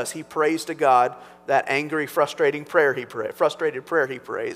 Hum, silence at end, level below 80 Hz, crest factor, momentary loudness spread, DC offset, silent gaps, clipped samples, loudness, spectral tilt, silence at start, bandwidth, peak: none; 0 s; -72 dBFS; 18 dB; 9 LU; under 0.1%; none; under 0.1%; -22 LUFS; -4 dB/octave; 0 s; 16 kHz; -4 dBFS